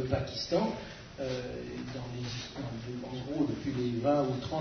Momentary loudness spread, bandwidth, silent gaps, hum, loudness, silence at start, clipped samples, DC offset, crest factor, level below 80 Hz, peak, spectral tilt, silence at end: 11 LU; 6.6 kHz; none; none; -34 LUFS; 0 s; under 0.1%; under 0.1%; 18 dB; -54 dBFS; -14 dBFS; -6.5 dB/octave; 0 s